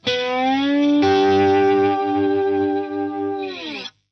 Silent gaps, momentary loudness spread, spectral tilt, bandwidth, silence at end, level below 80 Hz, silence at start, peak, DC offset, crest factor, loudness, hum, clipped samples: none; 12 LU; -6 dB/octave; 6.4 kHz; 0.2 s; -66 dBFS; 0.05 s; -8 dBFS; under 0.1%; 10 dB; -19 LUFS; none; under 0.1%